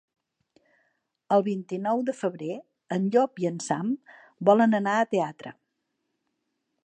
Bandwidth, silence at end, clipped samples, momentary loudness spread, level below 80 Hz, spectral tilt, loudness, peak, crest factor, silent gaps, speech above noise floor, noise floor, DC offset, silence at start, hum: 9.4 kHz; 1.35 s; under 0.1%; 14 LU; -80 dBFS; -6 dB/octave; -26 LUFS; -6 dBFS; 20 dB; none; 54 dB; -79 dBFS; under 0.1%; 1.3 s; none